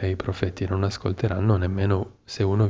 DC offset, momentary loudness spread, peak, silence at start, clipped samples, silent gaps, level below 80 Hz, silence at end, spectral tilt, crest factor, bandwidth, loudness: under 0.1%; 5 LU; -8 dBFS; 0 s; under 0.1%; none; -36 dBFS; 0 s; -7.5 dB/octave; 16 dB; 7.8 kHz; -25 LUFS